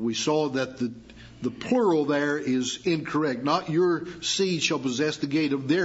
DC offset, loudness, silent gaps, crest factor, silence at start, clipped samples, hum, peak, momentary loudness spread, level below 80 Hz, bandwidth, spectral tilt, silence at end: under 0.1%; -26 LUFS; none; 16 dB; 0 s; under 0.1%; none; -10 dBFS; 9 LU; -60 dBFS; 8 kHz; -4.5 dB/octave; 0 s